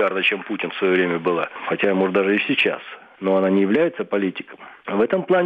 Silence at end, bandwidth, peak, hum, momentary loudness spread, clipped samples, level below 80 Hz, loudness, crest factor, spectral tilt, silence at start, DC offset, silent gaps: 0 s; 5 kHz; -6 dBFS; none; 10 LU; under 0.1%; -68 dBFS; -20 LUFS; 14 dB; -7.5 dB/octave; 0 s; under 0.1%; none